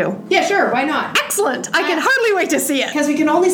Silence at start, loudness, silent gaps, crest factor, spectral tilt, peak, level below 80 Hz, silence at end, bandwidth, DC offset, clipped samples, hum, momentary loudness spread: 0 s; -16 LUFS; none; 14 dB; -2.5 dB/octave; -2 dBFS; -62 dBFS; 0 s; 18.5 kHz; under 0.1%; under 0.1%; none; 3 LU